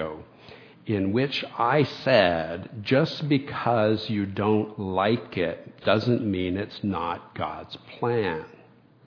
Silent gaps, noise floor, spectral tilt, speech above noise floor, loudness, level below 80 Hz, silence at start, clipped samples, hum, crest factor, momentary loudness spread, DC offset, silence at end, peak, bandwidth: none; -54 dBFS; -7.5 dB/octave; 29 dB; -25 LUFS; -60 dBFS; 0 s; under 0.1%; none; 22 dB; 11 LU; under 0.1%; 0.6 s; -4 dBFS; 5.4 kHz